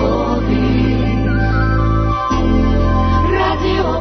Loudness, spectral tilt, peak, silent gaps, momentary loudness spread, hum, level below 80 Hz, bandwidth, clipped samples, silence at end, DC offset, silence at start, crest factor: -15 LUFS; -8 dB/octave; -4 dBFS; none; 2 LU; none; -20 dBFS; 6.4 kHz; under 0.1%; 0 s; under 0.1%; 0 s; 10 dB